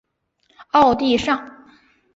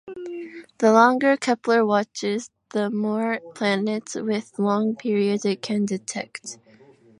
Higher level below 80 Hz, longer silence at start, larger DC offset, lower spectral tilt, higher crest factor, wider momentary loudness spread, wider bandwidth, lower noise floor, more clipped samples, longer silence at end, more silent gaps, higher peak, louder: first, -50 dBFS vs -74 dBFS; first, 0.75 s vs 0.05 s; neither; about the same, -4.5 dB/octave vs -5 dB/octave; about the same, 18 dB vs 20 dB; second, 8 LU vs 17 LU; second, 8 kHz vs 11 kHz; first, -65 dBFS vs -52 dBFS; neither; about the same, 0.65 s vs 0.65 s; neither; about the same, -4 dBFS vs -2 dBFS; first, -18 LUFS vs -22 LUFS